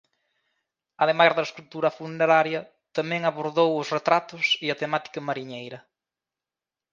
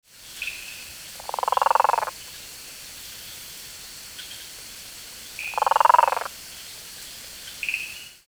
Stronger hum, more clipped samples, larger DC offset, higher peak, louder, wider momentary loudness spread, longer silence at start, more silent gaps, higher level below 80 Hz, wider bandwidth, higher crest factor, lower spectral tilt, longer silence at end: neither; neither; neither; about the same, -4 dBFS vs -2 dBFS; about the same, -24 LUFS vs -24 LUFS; second, 13 LU vs 18 LU; first, 1 s vs 0.2 s; neither; second, -78 dBFS vs -60 dBFS; second, 7.4 kHz vs over 20 kHz; about the same, 22 dB vs 26 dB; first, -4.5 dB/octave vs 0 dB/octave; first, 1.15 s vs 0.15 s